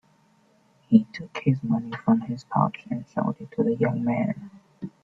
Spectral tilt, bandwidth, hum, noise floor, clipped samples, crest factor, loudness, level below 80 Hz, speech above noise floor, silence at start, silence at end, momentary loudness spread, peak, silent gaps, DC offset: -9 dB/octave; 7.2 kHz; none; -62 dBFS; under 0.1%; 22 dB; -25 LUFS; -62 dBFS; 37 dB; 0.9 s; 0.15 s; 13 LU; -4 dBFS; none; under 0.1%